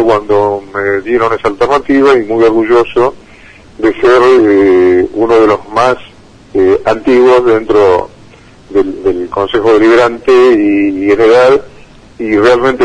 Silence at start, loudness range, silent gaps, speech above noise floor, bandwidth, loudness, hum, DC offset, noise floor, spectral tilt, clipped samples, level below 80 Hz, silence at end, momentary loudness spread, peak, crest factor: 0 s; 2 LU; none; 29 dB; 9.8 kHz; -9 LUFS; none; under 0.1%; -37 dBFS; -6 dB/octave; 0.2%; -38 dBFS; 0 s; 8 LU; 0 dBFS; 8 dB